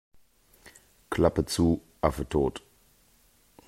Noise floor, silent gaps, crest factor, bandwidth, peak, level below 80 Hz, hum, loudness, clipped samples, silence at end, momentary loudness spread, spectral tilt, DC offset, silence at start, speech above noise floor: -63 dBFS; none; 24 dB; 16 kHz; -6 dBFS; -46 dBFS; none; -27 LUFS; under 0.1%; 1.1 s; 7 LU; -6 dB/octave; under 0.1%; 1.1 s; 37 dB